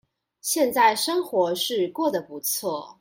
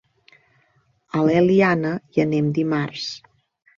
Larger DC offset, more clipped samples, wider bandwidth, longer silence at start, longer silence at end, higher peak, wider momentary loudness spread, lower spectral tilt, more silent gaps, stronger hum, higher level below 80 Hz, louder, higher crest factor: neither; neither; first, 17 kHz vs 7.4 kHz; second, 0.45 s vs 1.15 s; second, 0.1 s vs 0.6 s; about the same, -6 dBFS vs -4 dBFS; second, 8 LU vs 13 LU; second, -2 dB/octave vs -7 dB/octave; neither; neither; second, -72 dBFS vs -60 dBFS; second, -24 LUFS vs -20 LUFS; about the same, 18 dB vs 18 dB